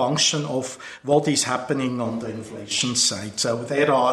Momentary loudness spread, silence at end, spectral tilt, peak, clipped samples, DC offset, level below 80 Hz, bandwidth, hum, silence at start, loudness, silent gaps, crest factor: 12 LU; 0 s; -3 dB/octave; -4 dBFS; under 0.1%; under 0.1%; -60 dBFS; 14.5 kHz; none; 0 s; -22 LUFS; none; 18 dB